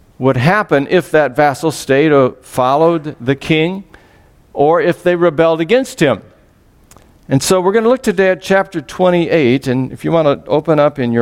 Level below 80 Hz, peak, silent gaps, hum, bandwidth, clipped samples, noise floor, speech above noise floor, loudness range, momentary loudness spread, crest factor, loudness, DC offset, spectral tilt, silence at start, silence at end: -46 dBFS; 0 dBFS; none; none; 16.5 kHz; under 0.1%; -48 dBFS; 36 dB; 2 LU; 6 LU; 12 dB; -13 LUFS; under 0.1%; -6 dB/octave; 0.2 s; 0 s